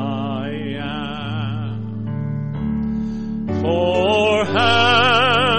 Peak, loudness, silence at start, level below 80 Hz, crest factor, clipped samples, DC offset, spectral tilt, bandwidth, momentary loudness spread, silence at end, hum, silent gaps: -4 dBFS; -19 LUFS; 0 s; -44 dBFS; 14 dB; under 0.1%; under 0.1%; -5.5 dB/octave; 8.8 kHz; 13 LU; 0 s; none; none